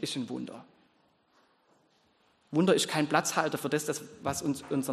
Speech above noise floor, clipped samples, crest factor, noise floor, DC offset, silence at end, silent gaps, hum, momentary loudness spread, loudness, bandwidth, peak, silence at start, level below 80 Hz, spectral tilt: 38 dB; under 0.1%; 22 dB; -69 dBFS; under 0.1%; 0 s; none; none; 12 LU; -30 LUFS; 13 kHz; -10 dBFS; 0 s; -68 dBFS; -4 dB/octave